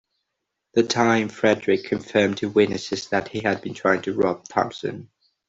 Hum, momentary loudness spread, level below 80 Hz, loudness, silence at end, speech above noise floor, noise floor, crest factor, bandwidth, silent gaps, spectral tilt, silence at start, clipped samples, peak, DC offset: none; 7 LU; -60 dBFS; -22 LUFS; 0.45 s; 58 dB; -80 dBFS; 20 dB; 8 kHz; none; -5 dB/octave; 0.75 s; under 0.1%; -4 dBFS; under 0.1%